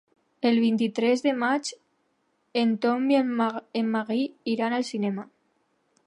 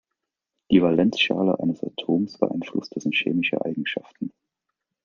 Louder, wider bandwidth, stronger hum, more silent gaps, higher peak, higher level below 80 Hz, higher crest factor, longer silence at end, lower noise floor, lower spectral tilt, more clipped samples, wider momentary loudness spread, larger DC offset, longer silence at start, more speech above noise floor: about the same, -25 LUFS vs -23 LUFS; first, 11 kHz vs 7 kHz; neither; neither; second, -10 dBFS vs -4 dBFS; second, -80 dBFS vs -62 dBFS; about the same, 16 dB vs 20 dB; about the same, 0.8 s vs 0.75 s; second, -71 dBFS vs -83 dBFS; about the same, -5 dB/octave vs -6 dB/octave; neither; second, 7 LU vs 11 LU; neither; second, 0.4 s vs 0.7 s; second, 47 dB vs 60 dB